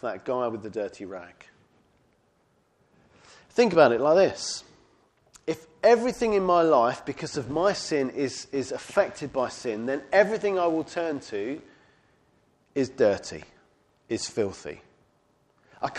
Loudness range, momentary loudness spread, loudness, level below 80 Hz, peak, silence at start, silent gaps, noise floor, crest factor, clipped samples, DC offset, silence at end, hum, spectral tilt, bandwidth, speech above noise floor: 7 LU; 15 LU; -26 LUFS; -62 dBFS; -4 dBFS; 0.05 s; none; -67 dBFS; 24 dB; under 0.1%; under 0.1%; 0 s; none; -4.5 dB/octave; 11.5 kHz; 42 dB